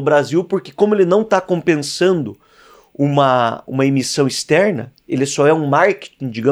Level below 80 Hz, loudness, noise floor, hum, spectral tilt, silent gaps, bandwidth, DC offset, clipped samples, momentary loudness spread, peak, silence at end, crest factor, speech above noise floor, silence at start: -62 dBFS; -16 LUFS; -47 dBFS; none; -5.5 dB/octave; none; 15 kHz; under 0.1%; under 0.1%; 8 LU; -2 dBFS; 0 s; 14 dB; 31 dB; 0 s